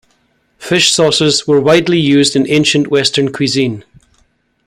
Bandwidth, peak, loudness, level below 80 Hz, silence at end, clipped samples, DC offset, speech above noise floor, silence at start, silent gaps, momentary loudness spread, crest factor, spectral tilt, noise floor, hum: 15 kHz; 0 dBFS; -11 LUFS; -50 dBFS; 0.85 s; under 0.1%; under 0.1%; 47 dB; 0.6 s; none; 6 LU; 12 dB; -4 dB/octave; -58 dBFS; none